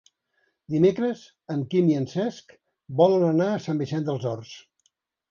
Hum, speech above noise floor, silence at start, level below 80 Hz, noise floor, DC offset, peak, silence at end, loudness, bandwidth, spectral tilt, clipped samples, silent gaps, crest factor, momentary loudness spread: none; 49 dB; 0.7 s; -68 dBFS; -72 dBFS; under 0.1%; -6 dBFS; 0.7 s; -24 LUFS; 7.2 kHz; -8 dB/octave; under 0.1%; none; 18 dB; 13 LU